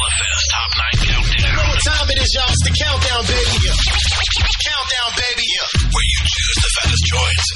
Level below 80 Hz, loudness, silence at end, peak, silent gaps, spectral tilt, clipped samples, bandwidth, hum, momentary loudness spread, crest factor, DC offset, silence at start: -20 dBFS; -15 LUFS; 0 s; -4 dBFS; none; -2.5 dB/octave; under 0.1%; 11.5 kHz; none; 2 LU; 12 dB; under 0.1%; 0 s